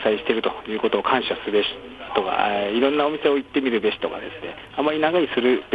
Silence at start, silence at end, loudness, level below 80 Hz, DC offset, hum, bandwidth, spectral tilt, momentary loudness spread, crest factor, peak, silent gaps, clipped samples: 0 s; 0 s; -22 LUFS; -56 dBFS; under 0.1%; none; 5 kHz; -6.5 dB/octave; 8 LU; 16 dB; -6 dBFS; none; under 0.1%